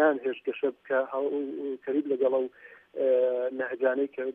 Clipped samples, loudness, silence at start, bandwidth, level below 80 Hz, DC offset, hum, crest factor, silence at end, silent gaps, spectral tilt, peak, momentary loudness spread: under 0.1%; -29 LUFS; 0 s; 3.7 kHz; -84 dBFS; under 0.1%; none; 16 dB; 0 s; none; -7.5 dB/octave; -12 dBFS; 8 LU